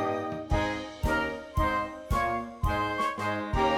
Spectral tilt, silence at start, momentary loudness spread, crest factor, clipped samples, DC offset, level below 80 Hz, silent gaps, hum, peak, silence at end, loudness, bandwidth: -6 dB/octave; 0 s; 4 LU; 16 dB; under 0.1%; under 0.1%; -38 dBFS; none; none; -14 dBFS; 0 s; -30 LUFS; 18 kHz